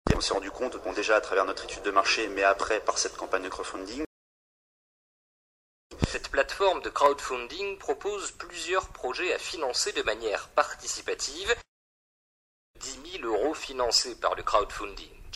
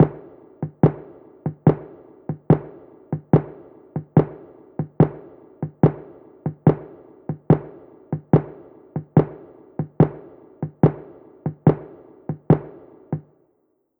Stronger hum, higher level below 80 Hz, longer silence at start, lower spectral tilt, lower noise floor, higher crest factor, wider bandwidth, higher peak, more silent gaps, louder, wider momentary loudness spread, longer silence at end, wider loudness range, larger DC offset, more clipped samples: neither; about the same, -48 dBFS vs -50 dBFS; about the same, 0.05 s vs 0 s; second, -2.5 dB/octave vs -13 dB/octave; first, under -90 dBFS vs -67 dBFS; about the same, 24 dB vs 20 dB; first, 15.5 kHz vs 3.6 kHz; about the same, -6 dBFS vs -4 dBFS; first, 4.06-5.90 s, 11.68-12.74 s vs none; second, -28 LUFS vs -22 LUFS; second, 11 LU vs 19 LU; second, 0 s vs 0.8 s; first, 6 LU vs 1 LU; neither; neither